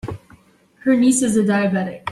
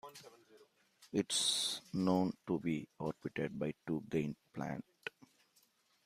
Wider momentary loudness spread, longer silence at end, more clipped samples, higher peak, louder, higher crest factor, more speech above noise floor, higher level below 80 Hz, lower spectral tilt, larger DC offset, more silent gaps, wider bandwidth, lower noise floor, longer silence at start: about the same, 15 LU vs 15 LU; second, 0 s vs 0.95 s; neither; first, -6 dBFS vs -20 dBFS; first, -17 LUFS vs -38 LUFS; second, 14 dB vs 20 dB; about the same, 35 dB vs 36 dB; first, -52 dBFS vs -74 dBFS; about the same, -5 dB/octave vs -4 dB/octave; neither; neither; second, 12.5 kHz vs 15.5 kHz; second, -51 dBFS vs -74 dBFS; about the same, 0.05 s vs 0.05 s